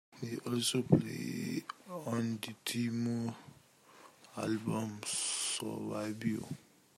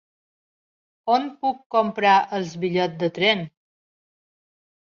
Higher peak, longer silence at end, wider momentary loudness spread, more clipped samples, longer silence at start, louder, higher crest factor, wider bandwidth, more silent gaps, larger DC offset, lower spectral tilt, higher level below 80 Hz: second, -12 dBFS vs -6 dBFS; second, 0.4 s vs 1.45 s; first, 12 LU vs 9 LU; neither; second, 0.1 s vs 1.05 s; second, -36 LUFS vs -22 LUFS; first, 26 dB vs 20 dB; first, 16 kHz vs 7.4 kHz; second, none vs 1.66-1.70 s; neither; about the same, -4.5 dB/octave vs -5.5 dB/octave; about the same, -74 dBFS vs -70 dBFS